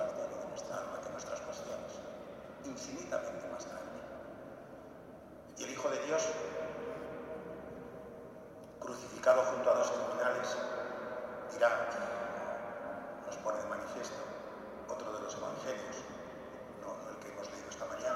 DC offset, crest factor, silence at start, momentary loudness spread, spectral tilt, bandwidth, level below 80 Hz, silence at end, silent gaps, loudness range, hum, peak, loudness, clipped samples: under 0.1%; 24 dB; 0 s; 17 LU; -3.5 dB/octave; 14.5 kHz; -70 dBFS; 0 s; none; 9 LU; none; -14 dBFS; -39 LUFS; under 0.1%